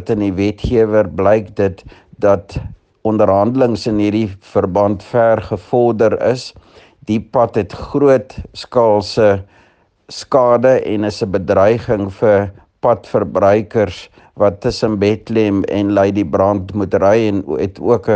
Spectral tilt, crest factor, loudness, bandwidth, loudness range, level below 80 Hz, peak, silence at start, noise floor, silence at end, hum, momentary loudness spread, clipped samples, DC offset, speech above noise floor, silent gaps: -7 dB/octave; 14 dB; -15 LUFS; 9 kHz; 2 LU; -42 dBFS; 0 dBFS; 0 s; -53 dBFS; 0 s; none; 8 LU; under 0.1%; under 0.1%; 38 dB; none